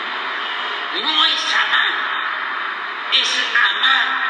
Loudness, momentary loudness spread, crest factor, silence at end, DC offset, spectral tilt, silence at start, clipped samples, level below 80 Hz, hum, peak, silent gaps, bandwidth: -17 LUFS; 8 LU; 18 dB; 0 s; under 0.1%; 1.5 dB/octave; 0 s; under 0.1%; under -90 dBFS; none; -2 dBFS; none; 9.8 kHz